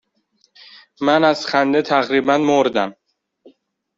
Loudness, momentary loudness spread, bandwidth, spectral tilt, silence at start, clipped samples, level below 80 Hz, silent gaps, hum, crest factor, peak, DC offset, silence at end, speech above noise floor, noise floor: -17 LUFS; 7 LU; 7.6 kHz; -5 dB/octave; 1 s; under 0.1%; -62 dBFS; none; none; 16 dB; -2 dBFS; under 0.1%; 1.05 s; 47 dB; -63 dBFS